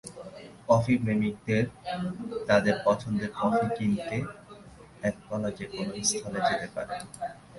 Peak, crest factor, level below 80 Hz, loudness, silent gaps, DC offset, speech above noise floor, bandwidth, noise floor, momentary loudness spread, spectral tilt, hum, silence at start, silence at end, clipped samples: -8 dBFS; 22 dB; -56 dBFS; -29 LUFS; none; under 0.1%; 21 dB; 11.5 kHz; -50 dBFS; 15 LU; -5 dB/octave; none; 0.05 s; 0 s; under 0.1%